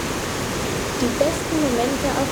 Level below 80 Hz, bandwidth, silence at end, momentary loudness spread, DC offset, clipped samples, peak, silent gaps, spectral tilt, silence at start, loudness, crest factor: -38 dBFS; over 20 kHz; 0 s; 4 LU; under 0.1%; under 0.1%; -4 dBFS; none; -4 dB/octave; 0 s; -22 LUFS; 18 dB